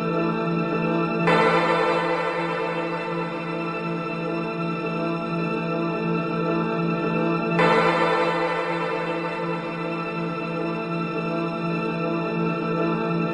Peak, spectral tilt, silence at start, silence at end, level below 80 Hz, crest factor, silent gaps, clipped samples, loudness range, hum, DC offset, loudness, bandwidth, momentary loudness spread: -6 dBFS; -7 dB/octave; 0 s; 0 s; -60 dBFS; 18 dB; none; under 0.1%; 4 LU; none; under 0.1%; -24 LUFS; 10 kHz; 8 LU